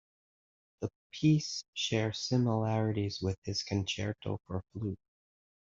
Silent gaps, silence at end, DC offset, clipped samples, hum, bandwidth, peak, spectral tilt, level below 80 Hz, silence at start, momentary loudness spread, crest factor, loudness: 0.96-1.10 s, 1.68-1.73 s, 3.38-3.42 s; 0.8 s; under 0.1%; under 0.1%; none; 7.6 kHz; -16 dBFS; -5.5 dB/octave; -64 dBFS; 0.8 s; 12 LU; 18 dB; -34 LUFS